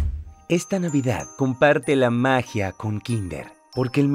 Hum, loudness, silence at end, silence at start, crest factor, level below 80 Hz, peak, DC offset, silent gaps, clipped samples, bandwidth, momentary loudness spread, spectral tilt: none; -22 LUFS; 0 s; 0 s; 18 dB; -40 dBFS; -4 dBFS; under 0.1%; none; under 0.1%; 15.5 kHz; 12 LU; -6 dB/octave